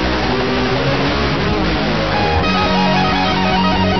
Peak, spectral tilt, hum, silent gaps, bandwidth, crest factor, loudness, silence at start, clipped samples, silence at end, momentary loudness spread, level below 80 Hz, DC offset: -2 dBFS; -6 dB/octave; none; none; 6.4 kHz; 12 dB; -15 LUFS; 0 s; under 0.1%; 0 s; 3 LU; -28 dBFS; 3%